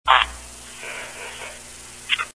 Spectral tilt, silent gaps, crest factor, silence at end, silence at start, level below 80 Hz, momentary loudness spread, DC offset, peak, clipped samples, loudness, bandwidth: 0 dB/octave; none; 26 dB; 0.05 s; 0.05 s; -46 dBFS; 20 LU; 0.2%; 0 dBFS; under 0.1%; -25 LUFS; 11 kHz